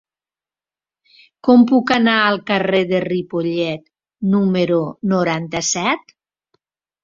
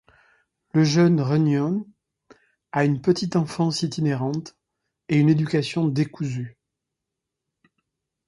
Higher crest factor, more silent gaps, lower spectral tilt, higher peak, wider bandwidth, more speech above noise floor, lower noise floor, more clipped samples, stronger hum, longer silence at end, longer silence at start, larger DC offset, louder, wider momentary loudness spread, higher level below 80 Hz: about the same, 18 dB vs 18 dB; neither; second, -4.5 dB/octave vs -7 dB/octave; first, -2 dBFS vs -6 dBFS; second, 7.6 kHz vs 11 kHz; first, over 74 dB vs 63 dB; first, under -90 dBFS vs -84 dBFS; neither; neither; second, 1.05 s vs 1.8 s; first, 1.45 s vs 0.75 s; neither; first, -17 LUFS vs -22 LUFS; about the same, 9 LU vs 11 LU; about the same, -58 dBFS vs -62 dBFS